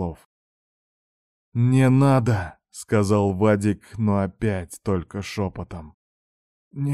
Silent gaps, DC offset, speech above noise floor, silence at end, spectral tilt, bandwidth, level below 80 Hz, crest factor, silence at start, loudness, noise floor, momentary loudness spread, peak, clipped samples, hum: 0.25-1.52 s, 5.94-6.71 s; under 0.1%; over 69 dB; 0 s; -7.5 dB/octave; 12.5 kHz; -50 dBFS; 16 dB; 0 s; -22 LUFS; under -90 dBFS; 18 LU; -6 dBFS; under 0.1%; none